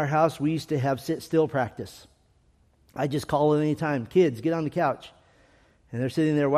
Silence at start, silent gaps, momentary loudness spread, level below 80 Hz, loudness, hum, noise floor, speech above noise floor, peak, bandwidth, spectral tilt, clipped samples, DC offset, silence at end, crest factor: 0 s; none; 11 LU; -60 dBFS; -26 LUFS; none; -63 dBFS; 38 dB; -8 dBFS; 15 kHz; -7 dB/octave; under 0.1%; under 0.1%; 0 s; 18 dB